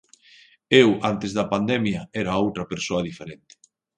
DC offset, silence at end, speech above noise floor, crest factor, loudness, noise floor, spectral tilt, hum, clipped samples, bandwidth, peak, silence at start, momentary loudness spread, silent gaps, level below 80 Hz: under 0.1%; 0.6 s; 32 dB; 22 dB; -22 LUFS; -54 dBFS; -5.5 dB/octave; none; under 0.1%; 9.6 kHz; -2 dBFS; 0.7 s; 13 LU; none; -54 dBFS